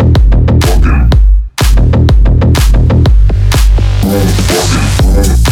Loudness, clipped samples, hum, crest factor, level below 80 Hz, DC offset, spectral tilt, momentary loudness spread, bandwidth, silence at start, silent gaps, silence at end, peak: -9 LUFS; under 0.1%; none; 6 dB; -8 dBFS; under 0.1%; -5.5 dB/octave; 2 LU; 16 kHz; 0 s; none; 0 s; 0 dBFS